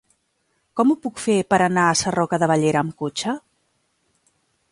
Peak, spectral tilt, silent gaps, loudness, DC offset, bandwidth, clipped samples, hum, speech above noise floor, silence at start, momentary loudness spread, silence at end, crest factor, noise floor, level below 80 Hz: -4 dBFS; -4.5 dB/octave; none; -20 LUFS; under 0.1%; 11.5 kHz; under 0.1%; none; 50 dB; 0.75 s; 9 LU; 1.3 s; 18 dB; -69 dBFS; -58 dBFS